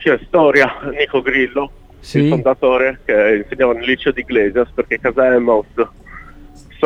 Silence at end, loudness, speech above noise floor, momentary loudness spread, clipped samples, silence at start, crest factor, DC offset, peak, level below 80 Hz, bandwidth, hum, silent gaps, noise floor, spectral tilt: 0 s; -15 LUFS; 24 dB; 8 LU; under 0.1%; 0 s; 16 dB; under 0.1%; 0 dBFS; -40 dBFS; 9.6 kHz; none; none; -38 dBFS; -7 dB/octave